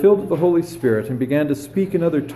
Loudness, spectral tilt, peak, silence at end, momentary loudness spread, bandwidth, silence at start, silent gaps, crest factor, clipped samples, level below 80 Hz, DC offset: -19 LUFS; -8 dB/octave; -4 dBFS; 0 s; 4 LU; 13 kHz; 0 s; none; 14 dB; under 0.1%; -54 dBFS; under 0.1%